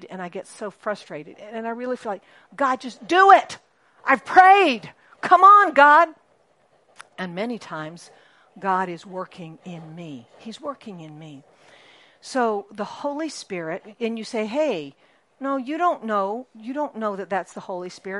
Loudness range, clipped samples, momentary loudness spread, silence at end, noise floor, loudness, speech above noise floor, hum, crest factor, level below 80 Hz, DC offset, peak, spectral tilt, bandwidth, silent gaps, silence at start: 16 LU; under 0.1%; 24 LU; 0 s; -62 dBFS; -20 LUFS; 40 dB; none; 22 dB; -74 dBFS; under 0.1%; 0 dBFS; -4.5 dB/octave; 11.5 kHz; none; 0 s